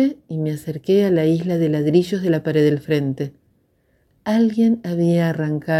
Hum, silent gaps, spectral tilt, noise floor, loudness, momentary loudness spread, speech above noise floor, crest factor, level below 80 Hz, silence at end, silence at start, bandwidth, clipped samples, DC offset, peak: none; none; -8 dB/octave; -62 dBFS; -19 LUFS; 9 LU; 44 dB; 16 dB; -60 dBFS; 0 s; 0 s; 14 kHz; under 0.1%; under 0.1%; -4 dBFS